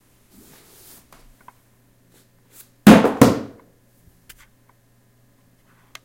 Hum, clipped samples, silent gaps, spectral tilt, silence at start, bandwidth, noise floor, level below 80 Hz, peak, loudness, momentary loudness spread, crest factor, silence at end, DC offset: none; 0.1%; none; -6 dB/octave; 2.85 s; 16.5 kHz; -58 dBFS; -48 dBFS; 0 dBFS; -14 LUFS; 17 LU; 22 dB; 2.6 s; under 0.1%